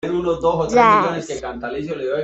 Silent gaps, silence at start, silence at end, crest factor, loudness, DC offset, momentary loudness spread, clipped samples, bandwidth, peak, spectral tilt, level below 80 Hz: none; 0.05 s; 0 s; 18 dB; -18 LUFS; under 0.1%; 14 LU; under 0.1%; 8.2 kHz; 0 dBFS; -5.5 dB/octave; -46 dBFS